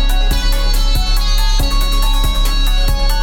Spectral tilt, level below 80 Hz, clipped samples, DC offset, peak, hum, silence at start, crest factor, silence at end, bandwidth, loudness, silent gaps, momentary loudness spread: -3.5 dB/octave; -12 dBFS; under 0.1%; under 0.1%; -6 dBFS; none; 0 s; 6 dB; 0 s; 17 kHz; -17 LUFS; none; 1 LU